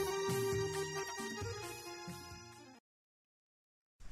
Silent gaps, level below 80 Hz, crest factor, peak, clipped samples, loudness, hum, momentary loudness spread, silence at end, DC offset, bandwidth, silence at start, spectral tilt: 2.80-3.99 s; -64 dBFS; 16 dB; -28 dBFS; under 0.1%; -40 LUFS; none; 18 LU; 0 s; under 0.1%; 16 kHz; 0 s; -4 dB/octave